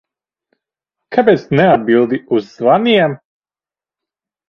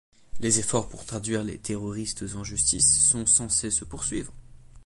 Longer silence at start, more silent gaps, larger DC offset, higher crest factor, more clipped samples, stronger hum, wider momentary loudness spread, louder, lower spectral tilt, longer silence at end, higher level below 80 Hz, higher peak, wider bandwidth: first, 1.1 s vs 0.35 s; neither; neither; about the same, 16 dB vs 20 dB; neither; neither; second, 8 LU vs 15 LU; first, -13 LUFS vs -24 LUFS; first, -8 dB/octave vs -2.5 dB/octave; first, 1.35 s vs 0.05 s; second, -56 dBFS vs -46 dBFS; first, 0 dBFS vs -6 dBFS; second, 6.8 kHz vs 11.5 kHz